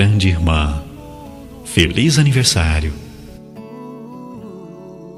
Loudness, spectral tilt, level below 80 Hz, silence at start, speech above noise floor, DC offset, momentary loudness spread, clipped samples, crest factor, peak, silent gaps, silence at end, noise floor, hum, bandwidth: -15 LUFS; -4.5 dB/octave; -30 dBFS; 0 s; 22 dB; under 0.1%; 23 LU; under 0.1%; 16 dB; -2 dBFS; none; 0 s; -36 dBFS; none; 14 kHz